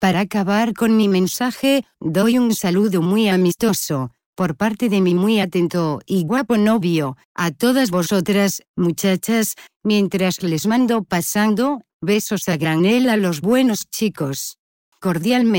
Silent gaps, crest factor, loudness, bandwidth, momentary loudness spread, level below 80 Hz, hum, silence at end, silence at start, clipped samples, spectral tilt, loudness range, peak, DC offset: 4.26-4.33 s, 7.25-7.35 s, 8.68-8.74 s, 9.76-9.80 s, 11.93-12.00 s, 14.59-14.92 s; 14 dB; -18 LUFS; 17 kHz; 7 LU; -56 dBFS; none; 0 s; 0 s; under 0.1%; -5 dB/octave; 2 LU; -4 dBFS; under 0.1%